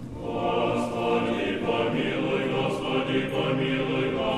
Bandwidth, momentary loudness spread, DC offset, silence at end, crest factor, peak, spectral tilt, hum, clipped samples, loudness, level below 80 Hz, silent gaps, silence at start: 13 kHz; 2 LU; under 0.1%; 0 s; 14 dB; -12 dBFS; -6.5 dB/octave; none; under 0.1%; -26 LUFS; -52 dBFS; none; 0 s